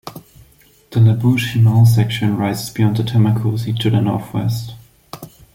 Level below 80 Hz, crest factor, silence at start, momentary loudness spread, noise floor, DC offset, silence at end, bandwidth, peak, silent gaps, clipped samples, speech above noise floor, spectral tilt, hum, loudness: -48 dBFS; 14 dB; 0.05 s; 18 LU; -50 dBFS; under 0.1%; 0.25 s; 16 kHz; -2 dBFS; none; under 0.1%; 35 dB; -7 dB/octave; none; -16 LUFS